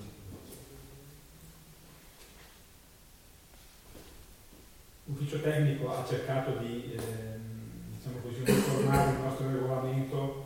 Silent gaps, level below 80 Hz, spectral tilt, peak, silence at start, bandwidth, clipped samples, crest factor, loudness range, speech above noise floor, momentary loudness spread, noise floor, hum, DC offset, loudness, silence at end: none; -54 dBFS; -6.5 dB/octave; -12 dBFS; 0 s; 17 kHz; under 0.1%; 22 dB; 22 LU; 26 dB; 26 LU; -57 dBFS; none; under 0.1%; -32 LUFS; 0 s